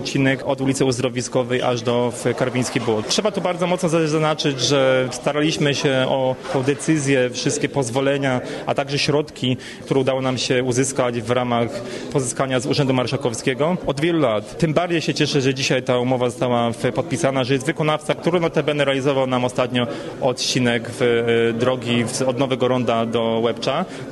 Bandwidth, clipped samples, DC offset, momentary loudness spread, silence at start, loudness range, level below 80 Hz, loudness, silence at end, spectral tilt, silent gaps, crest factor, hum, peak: 12.5 kHz; under 0.1%; under 0.1%; 4 LU; 0 s; 2 LU; -52 dBFS; -20 LUFS; 0 s; -5 dB/octave; none; 14 dB; none; -6 dBFS